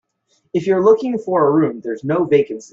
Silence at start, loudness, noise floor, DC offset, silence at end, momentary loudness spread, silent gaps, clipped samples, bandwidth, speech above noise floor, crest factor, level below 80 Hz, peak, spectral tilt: 0.55 s; -17 LUFS; -64 dBFS; under 0.1%; 0.05 s; 9 LU; none; under 0.1%; 7.6 kHz; 48 dB; 16 dB; -62 dBFS; -2 dBFS; -7.5 dB/octave